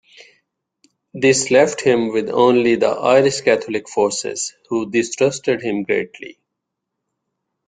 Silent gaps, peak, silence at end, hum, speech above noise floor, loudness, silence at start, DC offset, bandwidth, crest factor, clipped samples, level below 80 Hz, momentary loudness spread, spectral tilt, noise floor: none; -2 dBFS; 1.35 s; none; 62 dB; -17 LUFS; 1.15 s; under 0.1%; 9.6 kHz; 18 dB; under 0.1%; -60 dBFS; 10 LU; -4 dB/octave; -79 dBFS